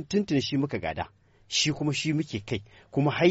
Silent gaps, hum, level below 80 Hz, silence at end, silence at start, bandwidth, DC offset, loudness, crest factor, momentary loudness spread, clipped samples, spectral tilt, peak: none; none; -56 dBFS; 0 s; 0 s; 8 kHz; under 0.1%; -28 LUFS; 18 dB; 10 LU; under 0.1%; -4.5 dB/octave; -10 dBFS